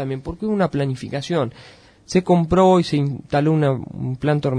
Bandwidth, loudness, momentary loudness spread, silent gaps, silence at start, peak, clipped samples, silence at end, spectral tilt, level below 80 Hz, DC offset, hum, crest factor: 10.5 kHz; -20 LUFS; 12 LU; none; 0 s; -2 dBFS; under 0.1%; 0 s; -7.5 dB/octave; -44 dBFS; under 0.1%; none; 18 dB